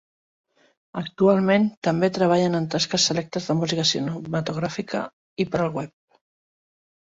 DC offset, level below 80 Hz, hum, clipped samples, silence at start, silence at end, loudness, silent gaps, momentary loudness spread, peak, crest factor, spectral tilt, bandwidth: under 0.1%; -60 dBFS; none; under 0.1%; 0.95 s; 1.15 s; -23 LUFS; 1.77-1.82 s, 5.13-5.37 s; 13 LU; -6 dBFS; 18 dB; -4.5 dB/octave; 8 kHz